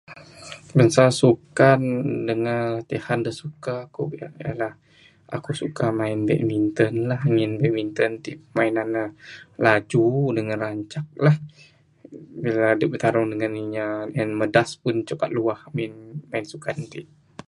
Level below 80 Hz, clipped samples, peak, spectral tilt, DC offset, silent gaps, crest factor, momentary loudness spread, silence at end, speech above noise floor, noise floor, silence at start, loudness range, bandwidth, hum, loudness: -60 dBFS; under 0.1%; 0 dBFS; -6.5 dB/octave; under 0.1%; none; 22 dB; 15 LU; 0.45 s; 20 dB; -42 dBFS; 0.1 s; 7 LU; 11.5 kHz; none; -23 LUFS